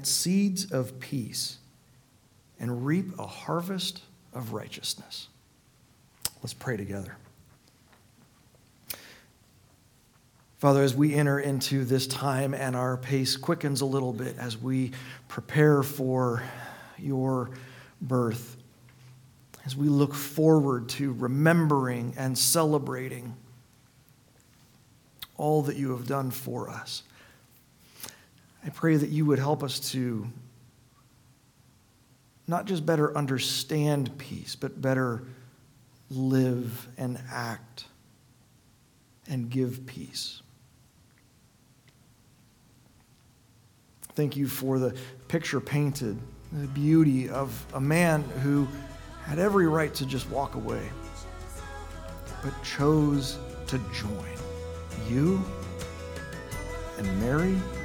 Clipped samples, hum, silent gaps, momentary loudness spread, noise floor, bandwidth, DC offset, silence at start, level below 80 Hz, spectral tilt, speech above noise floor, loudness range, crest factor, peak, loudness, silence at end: under 0.1%; none; none; 18 LU; -61 dBFS; 19 kHz; under 0.1%; 0 s; -50 dBFS; -5.5 dB/octave; 34 dB; 11 LU; 24 dB; -6 dBFS; -28 LUFS; 0 s